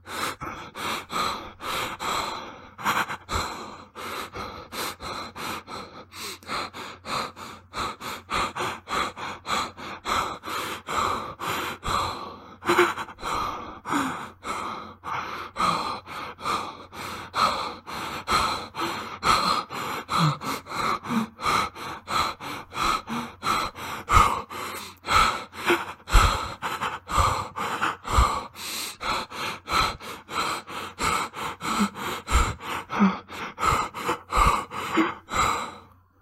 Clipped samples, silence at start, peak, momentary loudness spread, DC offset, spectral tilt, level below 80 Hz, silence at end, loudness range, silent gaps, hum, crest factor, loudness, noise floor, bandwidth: under 0.1%; 0.05 s; -4 dBFS; 13 LU; under 0.1%; -3.5 dB/octave; -38 dBFS; 0.35 s; 7 LU; none; none; 24 dB; -27 LUFS; -49 dBFS; 16 kHz